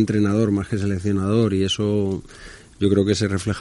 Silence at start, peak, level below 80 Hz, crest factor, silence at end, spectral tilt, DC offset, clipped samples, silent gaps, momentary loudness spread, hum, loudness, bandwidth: 0 s; -4 dBFS; -48 dBFS; 16 dB; 0 s; -6.5 dB/octave; under 0.1%; under 0.1%; none; 7 LU; none; -21 LUFS; 11.5 kHz